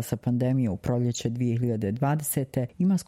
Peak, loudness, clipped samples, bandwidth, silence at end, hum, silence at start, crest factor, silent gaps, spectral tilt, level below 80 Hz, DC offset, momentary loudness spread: -12 dBFS; -27 LUFS; under 0.1%; 16.5 kHz; 0.05 s; none; 0 s; 14 dB; none; -6.5 dB/octave; -54 dBFS; under 0.1%; 3 LU